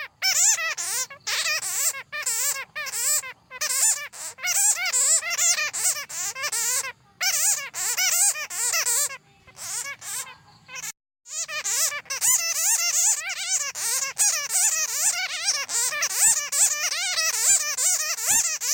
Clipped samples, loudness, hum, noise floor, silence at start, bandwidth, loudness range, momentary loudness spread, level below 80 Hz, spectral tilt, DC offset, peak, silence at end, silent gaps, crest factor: under 0.1%; -21 LUFS; none; -46 dBFS; 0 s; 17 kHz; 4 LU; 12 LU; -72 dBFS; 3.5 dB/octave; under 0.1%; -6 dBFS; 0 s; none; 18 dB